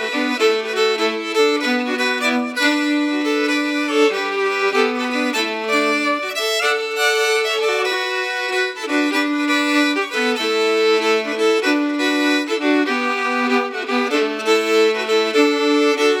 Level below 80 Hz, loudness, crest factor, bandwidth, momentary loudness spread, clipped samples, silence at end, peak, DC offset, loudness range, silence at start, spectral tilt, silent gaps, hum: -90 dBFS; -18 LUFS; 16 dB; 18 kHz; 4 LU; under 0.1%; 0 s; -2 dBFS; under 0.1%; 1 LU; 0 s; -1.5 dB/octave; none; none